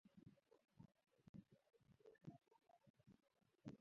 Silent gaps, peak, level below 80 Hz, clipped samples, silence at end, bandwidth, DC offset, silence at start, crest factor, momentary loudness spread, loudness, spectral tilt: 1.29-1.34 s, 2.90-2.94 s; -44 dBFS; -88 dBFS; under 0.1%; 0.05 s; 6.2 kHz; under 0.1%; 0.05 s; 24 dB; 3 LU; -65 LUFS; -8 dB/octave